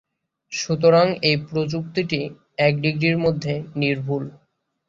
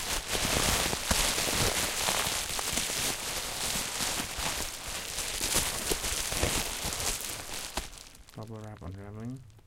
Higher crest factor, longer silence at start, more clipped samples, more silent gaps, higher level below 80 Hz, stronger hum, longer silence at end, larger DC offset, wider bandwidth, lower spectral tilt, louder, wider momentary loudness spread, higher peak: about the same, 18 dB vs 22 dB; first, 0.5 s vs 0 s; neither; neither; second, -56 dBFS vs -44 dBFS; neither; first, 0.55 s vs 0.05 s; neither; second, 7.6 kHz vs 17 kHz; first, -5.5 dB/octave vs -1.5 dB/octave; first, -21 LUFS vs -29 LUFS; second, 12 LU vs 16 LU; first, -4 dBFS vs -10 dBFS